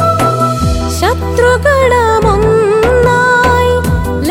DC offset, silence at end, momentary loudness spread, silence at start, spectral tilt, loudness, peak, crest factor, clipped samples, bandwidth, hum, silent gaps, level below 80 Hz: under 0.1%; 0 s; 5 LU; 0 s; -5.5 dB/octave; -10 LUFS; 0 dBFS; 10 dB; under 0.1%; 16.5 kHz; none; none; -22 dBFS